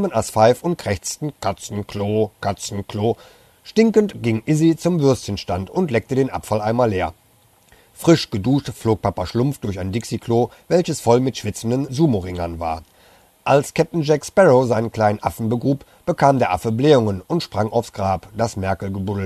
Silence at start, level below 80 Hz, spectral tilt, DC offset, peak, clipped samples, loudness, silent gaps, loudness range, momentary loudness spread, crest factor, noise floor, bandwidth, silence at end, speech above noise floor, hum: 0 s; -48 dBFS; -6 dB/octave; under 0.1%; -2 dBFS; under 0.1%; -20 LUFS; none; 4 LU; 10 LU; 18 dB; -55 dBFS; 13.5 kHz; 0 s; 36 dB; none